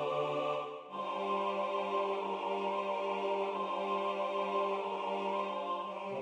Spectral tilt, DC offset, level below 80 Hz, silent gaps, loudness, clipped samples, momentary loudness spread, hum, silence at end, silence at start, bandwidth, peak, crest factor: -5.5 dB/octave; under 0.1%; -86 dBFS; none; -36 LUFS; under 0.1%; 4 LU; none; 0 s; 0 s; 9.8 kHz; -22 dBFS; 14 dB